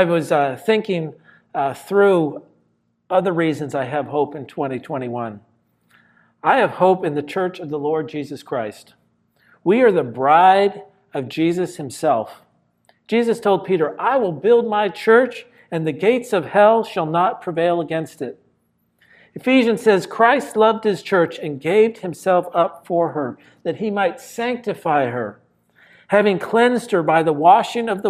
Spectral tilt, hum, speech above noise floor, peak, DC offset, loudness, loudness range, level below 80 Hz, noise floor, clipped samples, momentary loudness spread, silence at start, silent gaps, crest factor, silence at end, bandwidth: -6 dB/octave; none; 47 dB; 0 dBFS; under 0.1%; -18 LUFS; 5 LU; -70 dBFS; -65 dBFS; under 0.1%; 12 LU; 0 s; none; 18 dB; 0 s; 14.5 kHz